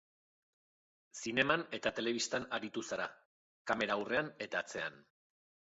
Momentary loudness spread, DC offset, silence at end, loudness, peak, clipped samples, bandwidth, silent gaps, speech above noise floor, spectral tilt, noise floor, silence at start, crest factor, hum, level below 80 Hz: 11 LU; under 0.1%; 0.65 s; -37 LUFS; -16 dBFS; under 0.1%; 8 kHz; 3.25-3.65 s; over 53 dB; -1.5 dB/octave; under -90 dBFS; 1.15 s; 24 dB; none; -74 dBFS